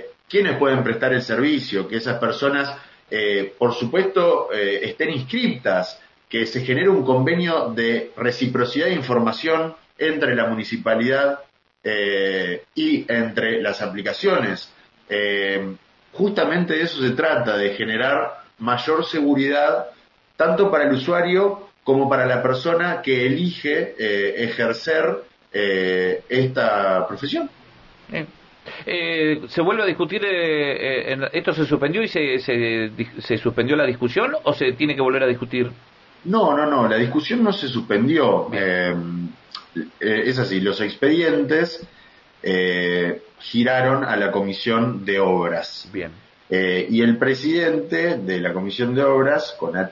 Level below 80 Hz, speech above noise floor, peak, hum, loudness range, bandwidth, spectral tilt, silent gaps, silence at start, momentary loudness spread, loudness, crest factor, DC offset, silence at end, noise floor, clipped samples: -62 dBFS; 28 dB; -4 dBFS; none; 3 LU; 7.4 kHz; -7 dB/octave; none; 0 s; 8 LU; -20 LUFS; 18 dB; under 0.1%; 0 s; -49 dBFS; under 0.1%